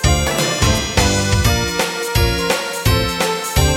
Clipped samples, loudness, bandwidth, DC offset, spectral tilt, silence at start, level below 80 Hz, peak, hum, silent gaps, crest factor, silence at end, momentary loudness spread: under 0.1%; -16 LUFS; 17 kHz; under 0.1%; -4 dB/octave; 0 s; -24 dBFS; 0 dBFS; none; none; 16 dB; 0 s; 3 LU